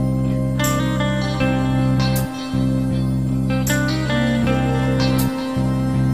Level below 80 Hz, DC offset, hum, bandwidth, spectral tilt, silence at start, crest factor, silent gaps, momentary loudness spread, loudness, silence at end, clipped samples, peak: -32 dBFS; 0.4%; none; 16 kHz; -6 dB/octave; 0 s; 14 dB; none; 3 LU; -19 LUFS; 0 s; under 0.1%; -4 dBFS